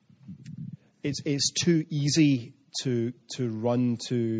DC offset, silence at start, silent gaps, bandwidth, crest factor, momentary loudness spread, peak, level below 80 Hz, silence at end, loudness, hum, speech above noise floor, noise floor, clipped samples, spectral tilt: under 0.1%; 0.25 s; none; 10 kHz; 16 dB; 19 LU; -12 dBFS; -68 dBFS; 0 s; -27 LUFS; none; 20 dB; -46 dBFS; under 0.1%; -5 dB/octave